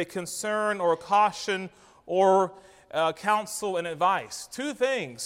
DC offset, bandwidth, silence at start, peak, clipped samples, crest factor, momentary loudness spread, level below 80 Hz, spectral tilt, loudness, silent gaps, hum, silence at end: under 0.1%; 16 kHz; 0 s; -10 dBFS; under 0.1%; 18 dB; 11 LU; -70 dBFS; -3.5 dB/octave; -26 LUFS; none; none; 0 s